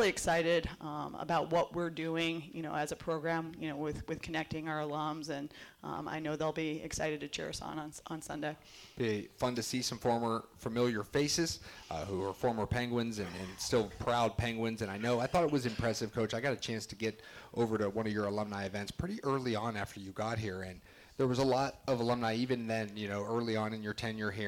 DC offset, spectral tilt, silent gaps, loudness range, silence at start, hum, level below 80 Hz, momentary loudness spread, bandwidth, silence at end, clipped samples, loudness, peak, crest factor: under 0.1%; -5 dB/octave; none; 4 LU; 0 s; none; -58 dBFS; 10 LU; 18 kHz; 0 s; under 0.1%; -36 LUFS; -22 dBFS; 14 dB